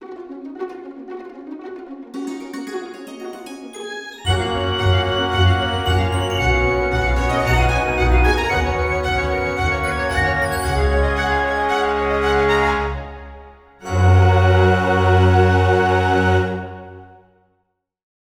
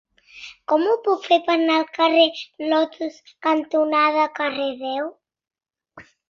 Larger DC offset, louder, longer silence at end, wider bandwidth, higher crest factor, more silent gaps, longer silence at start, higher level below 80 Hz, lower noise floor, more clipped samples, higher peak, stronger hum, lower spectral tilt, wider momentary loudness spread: neither; first, -17 LUFS vs -20 LUFS; first, 1.3 s vs 0.3 s; first, 15.5 kHz vs 7 kHz; about the same, 16 dB vs 18 dB; neither; second, 0 s vs 0.35 s; first, -28 dBFS vs -70 dBFS; first, -70 dBFS vs -49 dBFS; neither; about the same, -2 dBFS vs -4 dBFS; neither; first, -6 dB/octave vs -3.5 dB/octave; first, 19 LU vs 14 LU